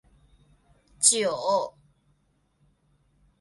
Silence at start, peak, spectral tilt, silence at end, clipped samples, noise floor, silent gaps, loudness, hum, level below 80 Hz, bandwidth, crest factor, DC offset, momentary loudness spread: 1 s; -4 dBFS; -0.5 dB/octave; 1.7 s; under 0.1%; -69 dBFS; none; -23 LUFS; none; -66 dBFS; 11.5 kHz; 26 dB; under 0.1%; 9 LU